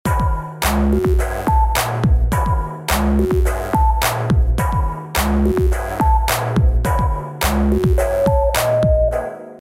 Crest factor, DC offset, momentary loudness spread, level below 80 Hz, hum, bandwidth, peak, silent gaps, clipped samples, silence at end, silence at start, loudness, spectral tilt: 12 dB; under 0.1%; 5 LU; -20 dBFS; none; 16.5 kHz; -4 dBFS; none; under 0.1%; 0 s; 0.05 s; -18 LUFS; -6 dB/octave